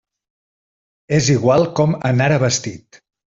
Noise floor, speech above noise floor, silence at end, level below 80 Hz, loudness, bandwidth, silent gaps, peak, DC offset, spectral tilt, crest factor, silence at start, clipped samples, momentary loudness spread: under -90 dBFS; over 74 dB; 0.6 s; -52 dBFS; -16 LUFS; 7.8 kHz; none; -2 dBFS; under 0.1%; -5 dB/octave; 16 dB; 1.1 s; under 0.1%; 6 LU